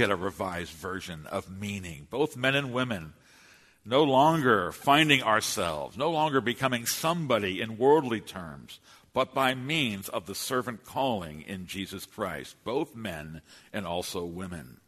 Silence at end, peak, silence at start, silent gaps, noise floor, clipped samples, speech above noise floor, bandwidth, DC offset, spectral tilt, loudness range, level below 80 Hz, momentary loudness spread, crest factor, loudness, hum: 0.15 s; -6 dBFS; 0 s; none; -58 dBFS; under 0.1%; 29 dB; 13.5 kHz; under 0.1%; -4 dB/octave; 10 LU; -60 dBFS; 16 LU; 24 dB; -28 LUFS; none